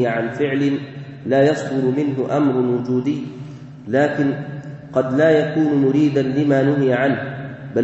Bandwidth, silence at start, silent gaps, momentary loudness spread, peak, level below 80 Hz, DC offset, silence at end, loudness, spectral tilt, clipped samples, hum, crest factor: 8.2 kHz; 0 s; none; 15 LU; -4 dBFS; -58 dBFS; under 0.1%; 0 s; -18 LUFS; -8 dB/octave; under 0.1%; none; 16 dB